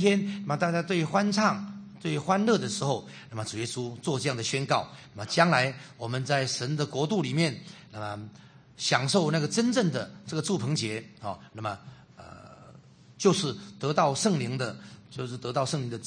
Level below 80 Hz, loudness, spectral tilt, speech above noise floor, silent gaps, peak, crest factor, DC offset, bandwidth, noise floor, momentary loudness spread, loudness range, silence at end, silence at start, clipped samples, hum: -68 dBFS; -28 LUFS; -4.5 dB/octave; 25 dB; none; -6 dBFS; 24 dB; under 0.1%; 9.8 kHz; -53 dBFS; 15 LU; 4 LU; 0 s; 0 s; under 0.1%; none